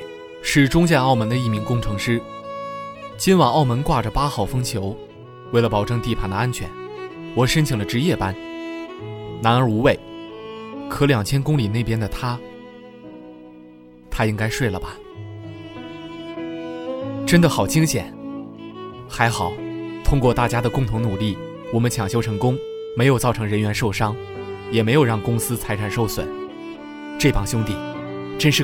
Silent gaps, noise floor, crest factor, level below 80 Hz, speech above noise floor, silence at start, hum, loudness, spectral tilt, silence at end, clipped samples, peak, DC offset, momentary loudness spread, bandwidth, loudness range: none; -44 dBFS; 20 dB; -36 dBFS; 25 dB; 0 s; none; -21 LUFS; -5.5 dB/octave; 0 s; under 0.1%; 0 dBFS; under 0.1%; 18 LU; 17 kHz; 6 LU